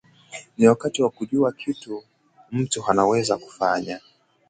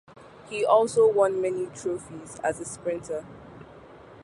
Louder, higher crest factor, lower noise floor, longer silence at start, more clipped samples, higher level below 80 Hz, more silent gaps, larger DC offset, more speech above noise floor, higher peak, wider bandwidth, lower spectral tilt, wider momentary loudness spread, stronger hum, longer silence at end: first, -22 LUFS vs -26 LUFS; about the same, 22 dB vs 20 dB; second, -43 dBFS vs -48 dBFS; about the same, 0.3 s vs 0.2 s; neither; about the same, -62 dBFS vs -62 dBFS; neither; neither; about the same, 21 dB vs 23 dB; first, -2 dBFS vs -8 dBFS; second, 9.6 kHz vs 11.5 kHz; about the same, -5 dB/octave vs -4.5 dB/octave; about the same, 18 LU vs 19 LU; neither; first, 0.5 s vs 0 s